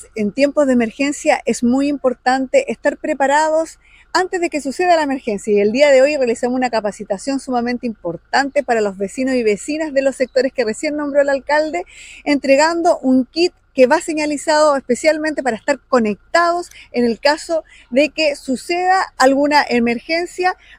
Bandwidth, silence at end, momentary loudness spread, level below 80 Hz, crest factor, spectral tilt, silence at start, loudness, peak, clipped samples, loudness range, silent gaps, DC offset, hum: 15 kHz; 0.25 s; 8 LU; -52 dBFS; 16 dB; -3.5 dB/octave; 0 s; -17 LUFS; 0 dBFS; under 0.1%; 3 LU; none; under 0.1%; none